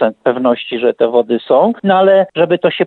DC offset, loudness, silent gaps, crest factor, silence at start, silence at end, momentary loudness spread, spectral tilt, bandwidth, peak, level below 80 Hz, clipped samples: under 0.1%; -13 LUFS; none; 12 dB; 0 s; 0 s; 5 LU; -8.5 dB/octave; 4.3 kHz; 0 dBFS; -62 dBFS; under 0.1%